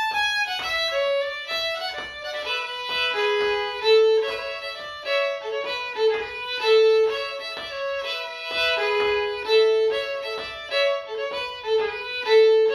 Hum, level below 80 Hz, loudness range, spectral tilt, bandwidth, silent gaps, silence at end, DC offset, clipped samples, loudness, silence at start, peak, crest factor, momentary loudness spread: none; -60 dBFS; 2 LU; -1 dB/octave; 13.5 kHz; none; 0 s; under 0.1%; under 0.1%; -23 LUFS; 0 s; -8 dBFS; 14 dB; 12 LU